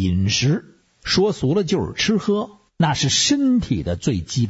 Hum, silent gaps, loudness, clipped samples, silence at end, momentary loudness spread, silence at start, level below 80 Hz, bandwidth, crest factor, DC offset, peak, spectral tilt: none; none; -19 LUFS; under 0.1%; 0 s; 7 LU; 0 s; -42 dBFS; 8 kHz; 14 dB; under 0.1%; -6 dBFS; -4.5 dB/octave